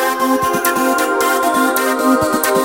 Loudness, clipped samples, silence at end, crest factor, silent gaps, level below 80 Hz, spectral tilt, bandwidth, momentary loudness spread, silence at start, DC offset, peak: -14 LUFS; under 0.1%; 0 s; 14 dB; none; -50 dBFS; -3 dB/octave; 17 kHz; 1 LU; 0 s; 0.2%; 0 dBFS